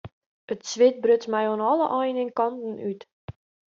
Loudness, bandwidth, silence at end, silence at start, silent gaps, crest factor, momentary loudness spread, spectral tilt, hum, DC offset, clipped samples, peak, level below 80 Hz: -24 LUFS; 7.4 kHz; 0.4 s; 0.05 s; 0.12-0.48 s, 3.12-3.28 s; 16 dB; 18 LU; -4 dB/octave; none; under 0.1%; under 0.1%; -8 dBFS; -66 dBFS